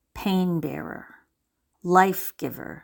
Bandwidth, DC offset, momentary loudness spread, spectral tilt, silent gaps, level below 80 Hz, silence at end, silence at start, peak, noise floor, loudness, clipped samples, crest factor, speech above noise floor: 17.5 kHz; under 0.1%; 17 LU; -6 dB/octave; none; -56 dBFS; 0.05 s; 0.15 s; -2 dBFS; -76 dBFS; -24 LUFS; under 0.1%; 24 dB; 52 dB